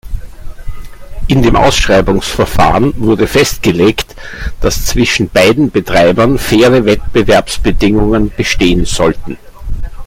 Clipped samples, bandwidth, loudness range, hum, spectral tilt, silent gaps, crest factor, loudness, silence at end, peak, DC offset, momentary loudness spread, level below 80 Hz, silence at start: under 0.1%; 17 kHz; 2 LU; none; -5 dB/octave; none; 10 dB; -10 LUFS; 0 s; 0 dBFS; under 0.1%; 17 LU; -20 dBFS; 0.05 s